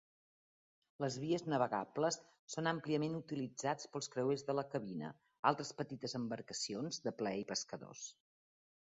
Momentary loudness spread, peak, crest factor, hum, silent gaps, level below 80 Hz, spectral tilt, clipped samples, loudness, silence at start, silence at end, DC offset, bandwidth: 10 LU; -16 dBFS; 26 dB; none; 2.39-2.47 s, 5.39-5.43 s; -82 dBFS; -4.5 dB/octave; under 0.1%; -40 LUFS; 1 s; 0.9 s; under 0.1%; 8 kHz